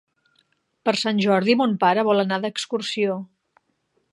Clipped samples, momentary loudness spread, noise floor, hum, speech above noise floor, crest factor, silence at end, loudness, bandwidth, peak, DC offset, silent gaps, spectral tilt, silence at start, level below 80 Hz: under 0.1%; 8 LU; -70 dBFS; none; 49 dB; 20 dB; 0.9 s; -21 LUFS; 11.5 kHz; -4 dBFS; under 0.1%; none; -5 dB/octave; 0.85 s; -74 dBFS